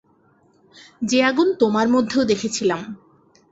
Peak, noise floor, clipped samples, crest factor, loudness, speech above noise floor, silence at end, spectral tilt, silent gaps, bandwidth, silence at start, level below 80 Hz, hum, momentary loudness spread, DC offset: -4 dBFS; -58 dBFS; under 0.1%; 16 dB; -19 LUFS; 39 dB; 0.55 s; -4 dB/octave; none; 8.2 kHz; 1 s; -60 dBFS; none; 12 LU; under 0.1%